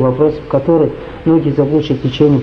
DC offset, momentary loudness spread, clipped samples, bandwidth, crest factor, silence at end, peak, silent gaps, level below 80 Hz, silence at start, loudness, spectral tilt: under 0.1%; 5 LU; under 0.1%; 6.4 kHz; 12 dB; 0 s; 0 dBFS; none; -38 dBFS; 0 s; -14 LUFS; -9.5 dB/octave